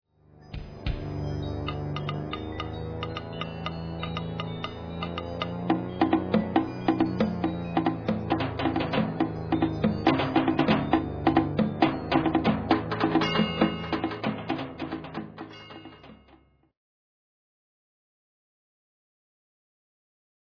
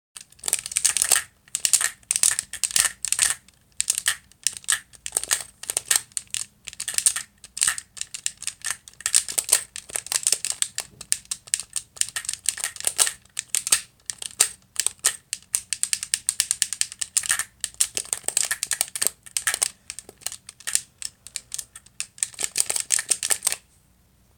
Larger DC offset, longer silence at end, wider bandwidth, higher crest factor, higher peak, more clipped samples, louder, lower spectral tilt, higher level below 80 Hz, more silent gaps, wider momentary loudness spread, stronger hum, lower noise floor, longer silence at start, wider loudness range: neither; first, 4.2 s vs 0.8 s; second, 5.4 kHz vs over 20 kHz; about the same, 24 dB vs 26 dB; second, -6 dBFS vs 0 dBFS; neither; second, -28 LUFS vs -23 LUFS; first, -8 dB/octave vs 2.5 dB/octave; first, -46 dBFS vs -62 dBFS; neither; about the same, 11 LU vs 12 LU; neither; about the same, -59 dBFS vs -60 dBFS; first, 0.35 s vs 0.15 s; first, 10 LU vs 4 LU